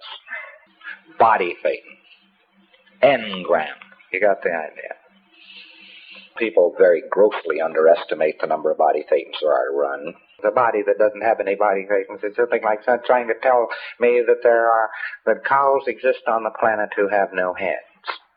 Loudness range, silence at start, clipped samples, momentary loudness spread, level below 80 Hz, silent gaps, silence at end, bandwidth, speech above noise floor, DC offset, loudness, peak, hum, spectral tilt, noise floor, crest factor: 4 LU; 0 s; under 0.1%; 16 LU; -70 dBFS; none; 0.2 s; 5 kHz; 39 dB; under 0.1%; -19 LUFS; -2 dBFS; none; -8.5 dB/octave; -58 dBFS; 18 dB